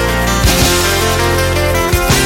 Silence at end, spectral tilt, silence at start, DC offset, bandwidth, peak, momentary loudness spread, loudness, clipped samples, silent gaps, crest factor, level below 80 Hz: 0 s; -3.5 dB/octave; 0 s; under 0.1%; 17 kHz; 0 dBFS; 3 LU; -12 LUFS; under 0.1%; none; 12 dB; -20 dBFS